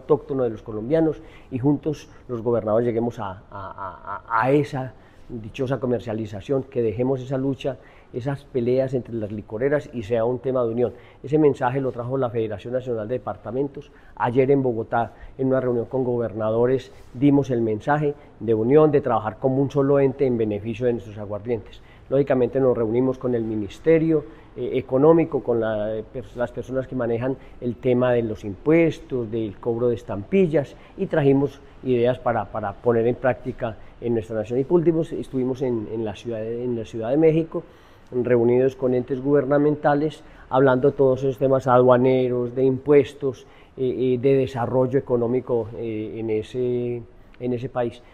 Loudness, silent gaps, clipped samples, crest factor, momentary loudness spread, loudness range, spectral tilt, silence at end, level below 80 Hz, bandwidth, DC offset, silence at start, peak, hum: -23 LUFS; none; under 0.1%; 20 dB; 12 LU; 5 LU; -9 dB/octave; 0.15 s; -50 dBFS; 9 kHz; under 0.1%; 0 s; -2 dBFS; none